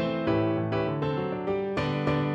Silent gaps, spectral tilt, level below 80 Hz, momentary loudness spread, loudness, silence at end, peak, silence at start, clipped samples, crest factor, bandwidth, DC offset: none; -8.5 dB/octave; -52 dBFS; 3 LU; -28 LUFS; 0 s; -12 dBFS; 0 s; under 0.1%; 14 dB; 8 kHz; under 0.1%